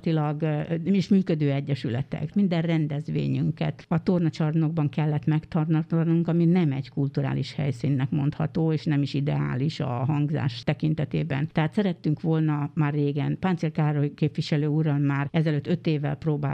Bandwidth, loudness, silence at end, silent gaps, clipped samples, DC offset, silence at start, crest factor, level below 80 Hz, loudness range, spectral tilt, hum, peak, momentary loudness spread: 7.8 kHz; -25 LUFS; 0 s; none; under 0.1%; under 0.1%; 0.05 s; 16 dB; -56 dBFS; 2 LU; -9 dB/octave; none; -8 dBFS; 5 LU